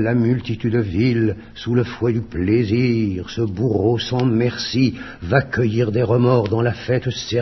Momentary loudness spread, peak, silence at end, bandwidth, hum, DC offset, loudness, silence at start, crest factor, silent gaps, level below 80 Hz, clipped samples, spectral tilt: 5 LU; 0 dBFS; 0 s; 6.2 kHz; none; under 0.1%; -19 LUFS; 0 s; 18 dB; none; -44 dBFS; under 0.1%; -7 dB/octave